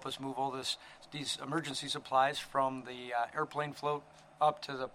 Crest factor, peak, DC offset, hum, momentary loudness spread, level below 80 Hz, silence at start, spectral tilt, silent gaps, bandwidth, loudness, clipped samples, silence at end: 20 dB; -16 dBFS; under 0.1%; none; 10 LU; -72 dBFS; 0 s; -3.5 dB/octave; none; 16 kHz; -35 LUFS; under 0.1%; 0.05 s